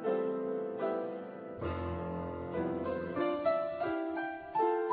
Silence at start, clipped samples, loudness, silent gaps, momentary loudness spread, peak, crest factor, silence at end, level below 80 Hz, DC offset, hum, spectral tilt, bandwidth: 0 s; under 0.1%; -36 LUFS; none; 7 LU; -18 dBFS; 16 dB; 0 s; -58 dBFS; under 0.1%; none; -6 dB/octave; 4.9 kHz